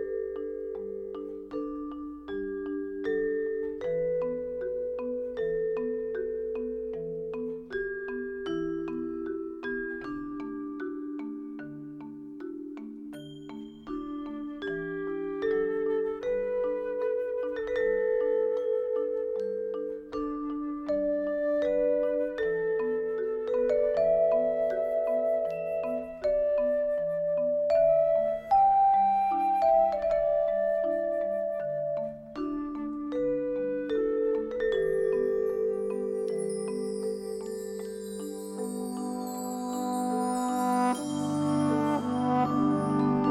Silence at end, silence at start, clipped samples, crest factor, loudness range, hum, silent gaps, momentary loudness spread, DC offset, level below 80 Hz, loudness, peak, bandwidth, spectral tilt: 0 s; 0 s; under 0.1%; 16 dB; 10 LU; none; none; 12 LU; under 0.1%; -58 dBFS; -30 LUFS; -14 dBFS; 15 kHz; -6.5 dB/octave